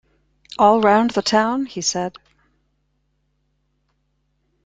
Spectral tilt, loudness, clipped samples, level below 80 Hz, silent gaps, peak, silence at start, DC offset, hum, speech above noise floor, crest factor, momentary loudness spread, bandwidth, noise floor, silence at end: -3.5 dB/octave; -18 LUFS; under 0.1%; -60 dBFS; none; -2 dBFS; 0.6 s; under 0.1%; none; 51 dB; 20 dB; 13 LU; 9.4 kHz; -68 dBFS; 2.55 s